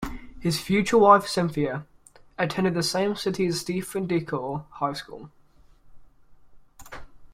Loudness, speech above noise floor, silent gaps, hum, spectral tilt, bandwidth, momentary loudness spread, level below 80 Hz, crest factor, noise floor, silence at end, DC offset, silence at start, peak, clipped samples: -24 LUFS; 30 dB; none; none; -5 dB/octave; 16 kHz; 25 LU; -50 dBFS; 22 dB; -54 dBFS; 0.05 s; under 0.1%; 0 s; -4 dBFS; under 0.1%